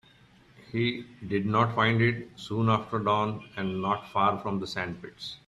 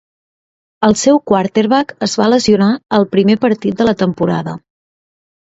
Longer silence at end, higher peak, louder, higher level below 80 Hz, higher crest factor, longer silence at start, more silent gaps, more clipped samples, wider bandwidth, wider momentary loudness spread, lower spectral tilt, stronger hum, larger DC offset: second, 0.1 s vs 0.85 s; second, -10 dBFS vs 0 dBFS; second, -28 LUFS vs -13 LUFS; second, -62 dBFS vs -50 dBFS; first, 20 dB vs 14 dB; second, 0.6 s vs 0.8 s; neither; neither; first, 10.5 kHz vs 8 kHz; first, 12 LU vs 6 LU; first, -7 dB/octave vs -5.5 dB/octave; neither; neither